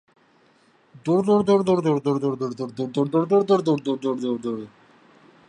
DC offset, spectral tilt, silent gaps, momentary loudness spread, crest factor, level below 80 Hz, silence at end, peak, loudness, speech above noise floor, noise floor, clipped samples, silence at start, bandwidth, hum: under 0.1%; -7.5 dB/octave; none; 11 LU; 16 dB; -66 dBFS; 0.8 s; -6 dBFS; -22 LUFS; 37 dB; -59 dBFS; under 0.1%; 1.05 s; 10 kHz; none